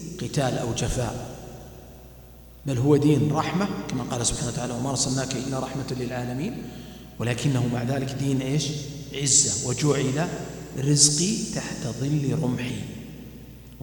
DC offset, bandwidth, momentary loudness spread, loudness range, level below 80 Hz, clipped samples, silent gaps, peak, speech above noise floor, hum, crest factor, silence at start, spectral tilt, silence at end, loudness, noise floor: under 0.1%; 19 kHz; 20 LU; 6 LU; -46 dBFS; under 0.1%; none; -2 dBFS; 21 dB; none; 24 dB; 0 s; -4 dB/octave; 0 s; -24 LUFS; -46 dBFS